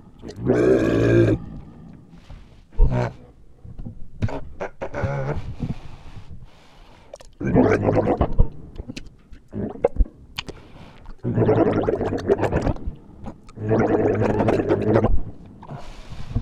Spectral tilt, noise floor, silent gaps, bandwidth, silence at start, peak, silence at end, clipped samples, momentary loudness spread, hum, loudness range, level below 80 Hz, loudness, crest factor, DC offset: -8.5 dB/octave; -47 dBFS; none; 9.2 kHz; 0.2 s; -2 dBFS; 0 s; under 0.1%; 22 LU; none; 9 LU; -30 dBFS; -22 LUFS; 20 dB; under 0.1%